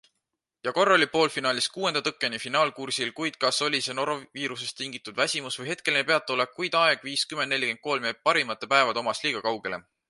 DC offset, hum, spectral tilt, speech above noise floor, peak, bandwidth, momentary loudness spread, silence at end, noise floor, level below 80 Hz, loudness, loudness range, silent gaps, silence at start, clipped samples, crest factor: under 0.1%; none; -2.5 dB/octave; 56 dB; -4 dBFS; 11.5 kHz; 9 LU; 0.3 s; -82 dBFS; -74 dBFS; -26 LUFS; 3 LU; none; 0.65 s; under 0.1%; 22 dB